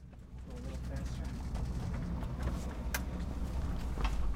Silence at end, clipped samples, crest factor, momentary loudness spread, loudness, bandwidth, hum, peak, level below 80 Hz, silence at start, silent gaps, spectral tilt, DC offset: 0 s; under 0.1%; 16 dB; 7 LU; -40 LUFS; 16 kHz; none; -20 dBFS; -38 dBFS; 0 s; none; -6 dB/octave; under 0.1%